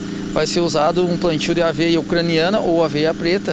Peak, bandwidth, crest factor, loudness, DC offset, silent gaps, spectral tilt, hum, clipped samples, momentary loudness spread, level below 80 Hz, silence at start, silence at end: -2 dBFS; 8.6 kHz; 14 dB; -18 LUFS; under 0.1%; none; -5.5 dB/octave; none; under 0.1%; 3 LU; -42 dBFS; 0 s; 0 s